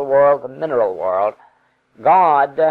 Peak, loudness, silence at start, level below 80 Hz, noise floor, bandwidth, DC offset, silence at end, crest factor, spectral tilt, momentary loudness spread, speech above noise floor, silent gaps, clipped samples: -4 dBFS; -16 LUFS; 0 s; -64 dBFS; -58 dBFS; 4.6 kHz; under 0.1%; 0 s; 12 dB; -8 dB/octave; 8 LU; 43 dB; none; under 0.1%